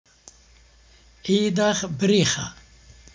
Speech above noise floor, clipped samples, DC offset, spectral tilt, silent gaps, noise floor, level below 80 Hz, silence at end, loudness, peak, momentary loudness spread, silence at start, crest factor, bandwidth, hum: 32 dB; under 0.1%; under 0.1%; -4.5 dB/octave; none; -53 dBFS; -54 dBFS; 0.6 s; -21 LUFS; -6 dBFS; 12 LU; 1.25 s; 18 dB; 7.6 kHz; none